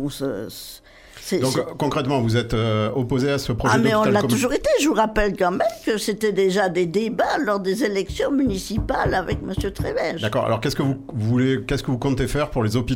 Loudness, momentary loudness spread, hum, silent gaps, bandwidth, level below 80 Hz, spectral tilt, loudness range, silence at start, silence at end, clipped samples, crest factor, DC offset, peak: -21 LUFS; 7 LU; none; none; 17 kHz; -38 dBFS; -5.5 dB/octave; 3 LU; 0 s; 0 s; under 0.1%; 18 dB; under 0.1%; -4 dBFS